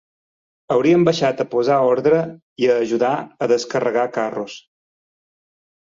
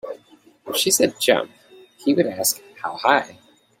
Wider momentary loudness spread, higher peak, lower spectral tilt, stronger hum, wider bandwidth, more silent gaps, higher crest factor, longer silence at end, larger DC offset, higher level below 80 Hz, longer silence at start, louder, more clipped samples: second, 10 LU vs 18 LU; second, -4 dBFS vs 0 dBFS; first, -6 dB/octave vs -2 dB/octave; neither; second, 7.6 kHz vs 16.5 kHz; first, 2.42-2.56 s vs none; second, 16 dB vs 22 dB; first, 1.25 s vs 0.5 s; neither; first, -62 dBFS vs -68 dBFS; first, 0.7 s vs 0.05 s; about the same, -18 LUFS vs -20 LUFS; neither